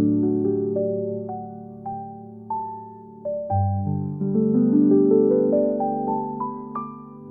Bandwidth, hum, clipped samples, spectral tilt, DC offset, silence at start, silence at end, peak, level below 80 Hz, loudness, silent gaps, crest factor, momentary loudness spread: 2.5 kHz; none; under 0.1%; -15.5 dB/octave; under 0.1%; 0 s; 0 s; -6 dBFS; -62 dBFS; -22 LUFS; none; 16 dB; 19 LU